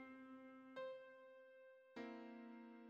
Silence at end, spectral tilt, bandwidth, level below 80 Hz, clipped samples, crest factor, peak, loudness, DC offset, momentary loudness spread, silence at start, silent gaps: 0 s; -3 dB/octave; 7.6 kHz; under -90 dBFS; under 0.1%; 16 dB; -42 dBFS; -58 LUFS; under 0.1%; 11 LU; 0 s; none